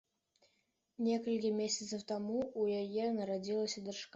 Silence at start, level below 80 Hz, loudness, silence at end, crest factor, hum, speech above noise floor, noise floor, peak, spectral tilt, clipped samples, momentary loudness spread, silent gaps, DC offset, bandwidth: 1 s; -78 dBFS; -37 LUFS; 0.1 s; 14 dB; none; 43 dB; -80 dBFS; -24 dBFS; -4.5 dB/octave; under 0.1%; 4 LU; none; under 0.1%; 8 kHz